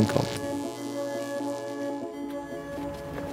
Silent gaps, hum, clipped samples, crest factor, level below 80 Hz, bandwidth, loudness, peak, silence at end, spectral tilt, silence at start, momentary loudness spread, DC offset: none; none; under 0.1%; 24 dB; -56 dBFS; 16.5 kHz; -33 LUFS; -6 dBFS; 0 s; -5.5 dB/octave; 0 s; 7 LU; under 0.1%